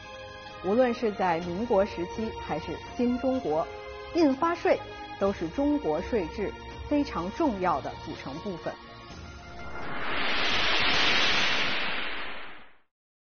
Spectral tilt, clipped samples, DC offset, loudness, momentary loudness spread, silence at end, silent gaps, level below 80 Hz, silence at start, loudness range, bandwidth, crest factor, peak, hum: -2 dB/octave; under 0.1%; under 0.1%; -28 LUFS; 18 LU; 0.35 s; none; -50 dBFS; 0 s; 6 LU; 6.6 kHz; 16 dB; -12 dBFS; none